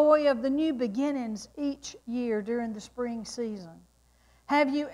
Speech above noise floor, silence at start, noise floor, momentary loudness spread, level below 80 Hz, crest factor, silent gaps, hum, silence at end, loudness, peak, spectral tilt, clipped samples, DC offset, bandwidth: 34 dB; 0 s; -63 dBFS; 11 LU; -64 dBFS; 18 dB; none; none; 0 s; -30 LUFS; -10 dBFS; -5 dB/octave; under 0.1%; under 0.1%; 12 kHz